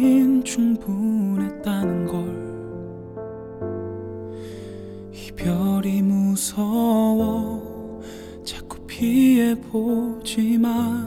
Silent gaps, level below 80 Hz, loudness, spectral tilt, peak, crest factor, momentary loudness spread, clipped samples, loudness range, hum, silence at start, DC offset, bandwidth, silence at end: none; -48 dBFS; -22 LUFS; -6 dB/octave; -8 dBFS; 14 dB; 18 LU; under 0.1%; 8 LU; none; 0 s; under 0.1%; 16.5 kHz; 0 s